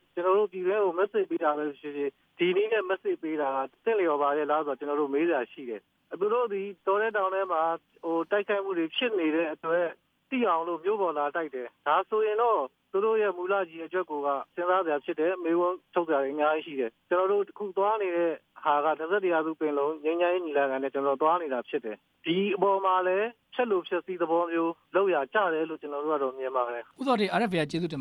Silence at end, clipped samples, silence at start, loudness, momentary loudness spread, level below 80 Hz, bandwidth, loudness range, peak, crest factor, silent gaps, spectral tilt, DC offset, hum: 0 s; under 0.1%; 0.15 s; -28 LUFS; 7 LU; -82 dBFS; 10.5 kHz; 1 LU; -12 dBFS; 16 dB; none; -6.5 dB/octave; under 0.1%; none